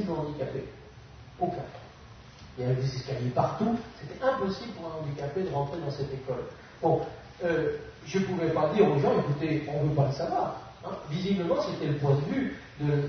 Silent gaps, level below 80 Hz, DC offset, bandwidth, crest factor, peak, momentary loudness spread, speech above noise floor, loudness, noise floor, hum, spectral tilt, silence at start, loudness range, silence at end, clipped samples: none; -54 dBFS; under 0.1%; 6.6 kHz; 20 dB; -10 dBFS; 16 LU; 21 dB; -30 LUFS; -49 dBFS; none; -7.5 dB/octave; 0 s; 5 LU; 0 s; under 0.1%